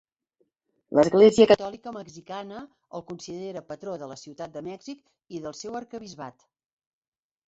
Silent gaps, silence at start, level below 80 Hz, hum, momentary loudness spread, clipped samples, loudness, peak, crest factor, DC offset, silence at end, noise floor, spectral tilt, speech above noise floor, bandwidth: none; 0.9 s; -64 dBFS; none; 24 LU; under 0.1%; -21 LUFS; -4 dBFS; 22 dB; under 0.1%; 1.15 s; -73 dBFS; -5.5 dB/octave; 48 dB; 8 kHz